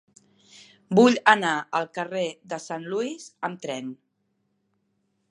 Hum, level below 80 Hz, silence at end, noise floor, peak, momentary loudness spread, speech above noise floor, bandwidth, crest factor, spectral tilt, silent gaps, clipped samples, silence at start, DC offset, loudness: none; -76 dBFS; 1.35 s; -73 dBFS; 0 dBFS; 15 LU; 50 dB; 11 kHz; 26 dB; -4.5 dB/octave; none; under 0.1%; 0.9 s; under 0.1%; -24 LUFS